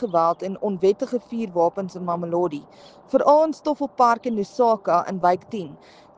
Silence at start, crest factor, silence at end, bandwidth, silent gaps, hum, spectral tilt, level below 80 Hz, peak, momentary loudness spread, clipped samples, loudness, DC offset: 0 s; 18 dB; 0.4 s; 9 kHz; none; none; -7 dB/octave; -66 dBFS; -4 dBFS; 9 LU; under 0.1%; -22 LUFS; under 0.1%